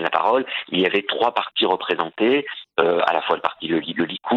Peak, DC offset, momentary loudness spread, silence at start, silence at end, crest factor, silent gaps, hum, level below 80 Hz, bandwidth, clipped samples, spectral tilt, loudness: 0 dBFS; under 0.1%; 5 LU; 0 s; 0 s; 20 dB; none; none; -68 dBFS; 7 kHz; under 0.1%; -6.5 dB/octave; -21 LUFS